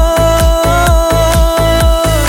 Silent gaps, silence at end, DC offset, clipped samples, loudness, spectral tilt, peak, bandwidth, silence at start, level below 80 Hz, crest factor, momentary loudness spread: none; 0 s; under 0.1%; under 0.1%; -10 LUFS; -5 dB/octave; 0 dBFS; 17 kHz; 0 s; -14 dBFS; 8 dB; 1 LU